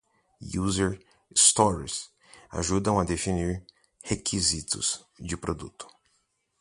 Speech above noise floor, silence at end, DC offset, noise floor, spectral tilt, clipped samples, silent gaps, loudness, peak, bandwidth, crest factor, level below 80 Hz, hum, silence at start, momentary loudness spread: 46 dB; 0.75 s; under 0.1%; -73 dBFS; -3.5 dB/octave; under 0.1%; none; -26 LUFS; -4 dBFS; 11.5 kHz; 24 dB; -46 dBFS; none; 0.4 s; 23 LU